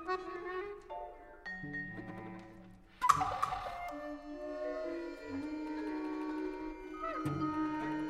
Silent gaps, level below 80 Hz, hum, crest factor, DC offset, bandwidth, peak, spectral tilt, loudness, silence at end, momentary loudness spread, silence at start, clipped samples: none; -60 dBFS; none; 30 dB; under 0.1%; 15 kHz; -10 dBFS; -5.5 dB/octave; -39 LUFS; 0 s; 13 LU; 0 s; under 0.1%